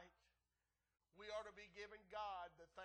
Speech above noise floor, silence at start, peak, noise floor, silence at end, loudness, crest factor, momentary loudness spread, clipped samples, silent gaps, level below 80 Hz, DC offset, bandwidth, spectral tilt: over 35 dB; 0 s; -38 dBFS; under -90 dBFS; 0 s; -54 LUFS; 18 dB; 9 LU; under 0.1%; none; -80 dBFS; under 0.1%; 9.4 kHz; -3 dB/octave